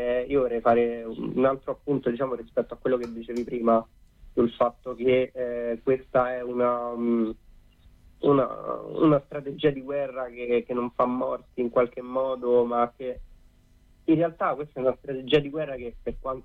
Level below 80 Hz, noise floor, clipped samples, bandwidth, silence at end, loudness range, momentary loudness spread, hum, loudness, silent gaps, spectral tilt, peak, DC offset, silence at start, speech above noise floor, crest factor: -52 dBFS; -57 dBFS; under 0.1%; 6.6 kHz; 0.05 s; 2 LU; 10 LU; none; -26 LUFS; none; -8.5 dB/octave; -10 dBFS; under 0.1%; 0 s; 32 dB; 16 dB